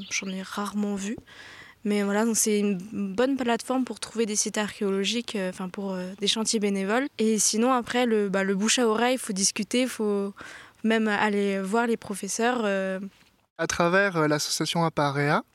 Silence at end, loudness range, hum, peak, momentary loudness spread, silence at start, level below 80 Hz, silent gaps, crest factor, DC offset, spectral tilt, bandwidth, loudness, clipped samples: 0.15 s; 4 LU; none; -6 dBFS; 10 LU; 0 s; -64 dBFS; 13.50-13.56 s; 20 dB; under 0.1%; -3.5 dB/octave; 15.5 kHz; -26 LUFS; under 0.1%